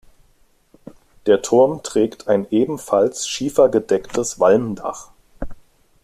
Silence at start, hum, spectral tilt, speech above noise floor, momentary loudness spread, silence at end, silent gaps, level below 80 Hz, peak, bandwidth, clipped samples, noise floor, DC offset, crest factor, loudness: 1.25 s; none; -4.5 dB/octave; 39 dB; 18 LU; 0.5 s; none; -46 dBFS; -2 dBFS; 14.5 kHz; under 0.1%; -57 dBFS; under 0.1%; 18 dB; -18 LUFS